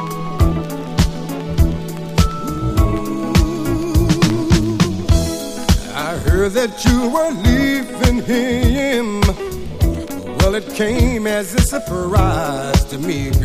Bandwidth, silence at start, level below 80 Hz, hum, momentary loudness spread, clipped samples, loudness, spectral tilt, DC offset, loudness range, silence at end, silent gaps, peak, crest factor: 15.5 kHz; 0 s; -22 dBFS; none; 7 LU; under 0.1%; -17 LUFS; -5.5 dB/octave; under 0.1%; 2 LU; 0 s; none; 0 dBFS; 16 dB